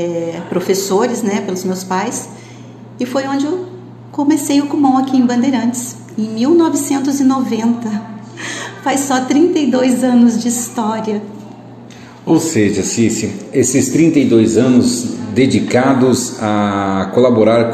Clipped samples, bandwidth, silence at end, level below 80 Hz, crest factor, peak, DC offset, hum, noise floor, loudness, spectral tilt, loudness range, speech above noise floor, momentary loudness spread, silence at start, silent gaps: under 0.1%; 14 kHz; 0 s; -50 dBFS; 14 dB; 0 dBFS; under 0.1%; none; -35 dBFS; -14 LUFS; -5 dB/octave; 6 LU; 22 dB; 13 LU; 0 s; none